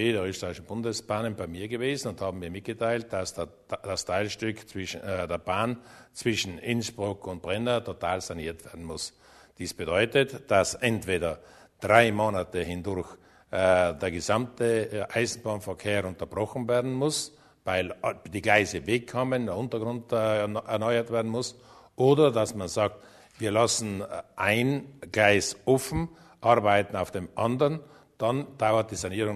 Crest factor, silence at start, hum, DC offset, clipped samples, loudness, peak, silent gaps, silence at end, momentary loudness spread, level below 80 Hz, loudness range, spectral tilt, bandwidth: 24 dB; 0 s; none; under 0.1%; under 0.1%; -28 LUFS; -4 dBFS; none; 0 s; 13 LU; -56 dBFS; 6 LU; -4.5 dB/octave; 13.5 kHz